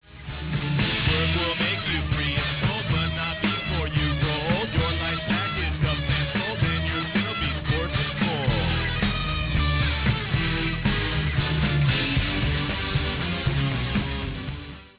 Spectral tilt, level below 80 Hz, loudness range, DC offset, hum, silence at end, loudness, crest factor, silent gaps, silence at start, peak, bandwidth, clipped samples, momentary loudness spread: -9.5 dB/octave; -32 dBFS; 1 LU; under 0.1%; none; 0.1 s; -24 LUFS; 14 dB; none; 0.1 s; -10 dBFS; 4 kHz; under 0.1%; 4 LU